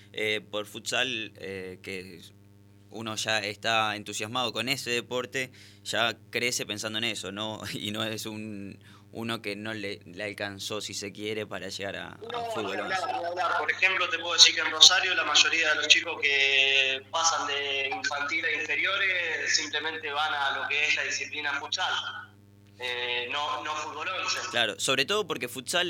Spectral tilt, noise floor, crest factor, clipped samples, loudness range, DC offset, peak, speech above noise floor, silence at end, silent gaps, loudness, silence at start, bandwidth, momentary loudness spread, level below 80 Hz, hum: -1 dB/octave; -55 dBFS; 28 dB; under 0.1%; 14 LU; under 0.1%; 0 dBFS; 27 dB; 0 s; none; -26 LUFS; 0 s; 19 kHz; 16 LU; -74 dBFS; 50 Hz at -55 dBFS